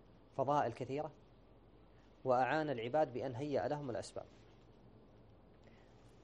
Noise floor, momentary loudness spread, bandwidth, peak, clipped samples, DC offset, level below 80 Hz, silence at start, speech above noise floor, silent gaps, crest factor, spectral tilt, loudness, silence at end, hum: -64 dBFS; 14 LU; 9.4 kHz; -22 dBFS; under 0.1%; under 0.1%; -70 dBFS; 0.35 s; 26 dB; none; 20 dB; -6.5 dB/octave; -39 LUFS; 0.15 s; none